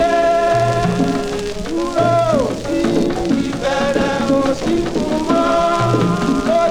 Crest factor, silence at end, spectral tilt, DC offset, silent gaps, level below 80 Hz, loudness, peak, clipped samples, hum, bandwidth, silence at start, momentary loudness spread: 12 dB; 0 s; -6 dB/octave; under 0.1%; none; -36 dBFS; -17 LUFS; -4 dBFS; under 0.1%; none; 16 kHz; 0 s; 5 LU